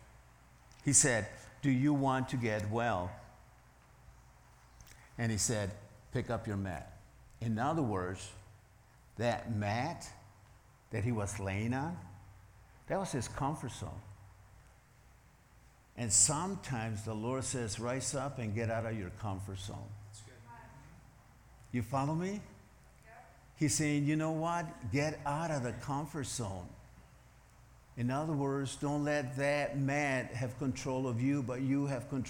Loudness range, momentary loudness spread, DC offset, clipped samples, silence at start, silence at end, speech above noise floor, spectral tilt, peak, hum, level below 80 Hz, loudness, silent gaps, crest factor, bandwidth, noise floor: 8 LU; 17 LU; under 0.1%; under 0.1%; 0 s; 0 s; 27 dB; -4.5 dB/octave; -12 dBFS; none; -60 dBFS; -35 LUFS; none; 24 dB; 18 kHz; -62 dBFS